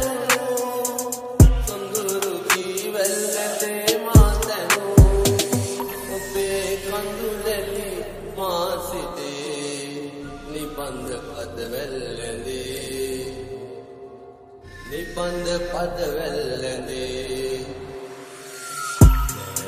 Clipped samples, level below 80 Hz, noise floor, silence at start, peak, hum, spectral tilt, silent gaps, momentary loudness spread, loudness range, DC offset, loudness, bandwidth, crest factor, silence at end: under 0.1%; -28 dBFS; -43 dBFS; 0 s; 0 dBFS; none; -4.5 dB/octave; none; 18 LU; 12 LU; under 0.1%; -23 LUFS; 15.5 kHz; 22 dB; 0 s